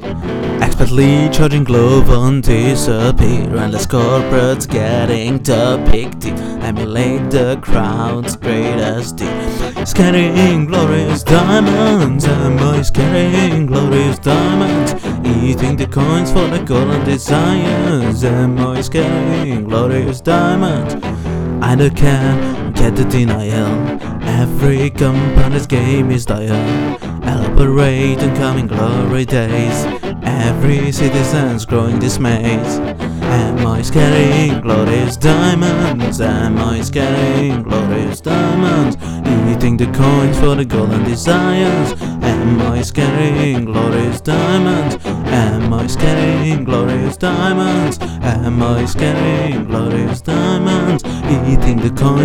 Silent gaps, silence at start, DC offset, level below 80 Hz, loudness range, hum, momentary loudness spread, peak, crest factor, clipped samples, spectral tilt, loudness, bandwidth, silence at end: none; 0 s; under 0.1%; -24 dBFS; 3 LU; none; 6 LU; 0 dBFS; 12 dB; 0.3%; -6.5 dB/octave; -14 LUFS; 16.5 kHz; 0 s